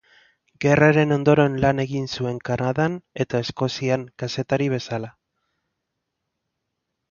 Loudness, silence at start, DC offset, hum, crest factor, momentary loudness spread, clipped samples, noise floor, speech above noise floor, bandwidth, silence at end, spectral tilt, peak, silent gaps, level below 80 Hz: -22 LUFS; 0.6 s; under 0.1%; none; 20 dB; 12 LU; under 0.1%; -79 dBFS; 58 dB; 7.2 kHz; 2 s; -6.5 dB/octave; -2 dBFS; none; -52 dBFS